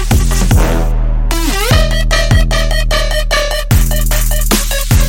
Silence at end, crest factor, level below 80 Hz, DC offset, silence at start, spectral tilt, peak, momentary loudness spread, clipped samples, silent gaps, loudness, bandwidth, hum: 0 s; 10 dB; -12 dBFS; under 0.1%; 0 s; -4 dB/octave; 0 dBFS; 4 LU; under 0.1%; none; -13 LUFS; 17 kHz; none